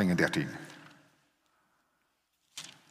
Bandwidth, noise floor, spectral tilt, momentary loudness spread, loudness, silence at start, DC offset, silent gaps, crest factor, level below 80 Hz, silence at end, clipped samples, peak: 15 kHz; -77 dBFS; -5.5 dB/octave; 21 LU; -31 LUFS; 0 s; under 0.1%; none; 24 dB; -70 dBFS; 0.2 s; under 0.1%; -12 dBFS